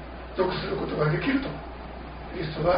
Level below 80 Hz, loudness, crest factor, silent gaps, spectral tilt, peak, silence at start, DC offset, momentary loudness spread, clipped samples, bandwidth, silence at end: -42 dBFS; -28 LUFS; 16 dB; none; -5 dB/octave; -12 dBFS; 0 s; under 0.1%; 14 LU; under 0.1%; 5.2 kHz; 0 s